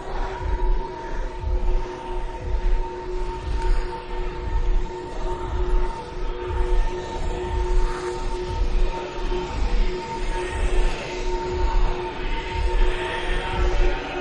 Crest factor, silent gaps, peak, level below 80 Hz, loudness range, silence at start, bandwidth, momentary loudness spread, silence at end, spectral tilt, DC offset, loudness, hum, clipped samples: 14 dB; none; -8 dBFS; -24 dBFS; 3 LU; 0 s; 9.4 kHz; 6 LU; 0 s; -6 dB/octave; under 0.1%; -28 LUFS; none; under 0.1%